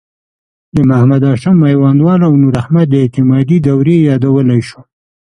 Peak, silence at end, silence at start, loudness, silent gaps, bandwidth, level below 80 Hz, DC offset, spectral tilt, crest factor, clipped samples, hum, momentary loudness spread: 0 dBFS; 0.5 s; 0.75 s; -10 LUFS; none; 9.8 kHz; -42 dBFS; under 0.1%; -9.5 dB/octave; 10 dB; under 0.1%; none; 4 LU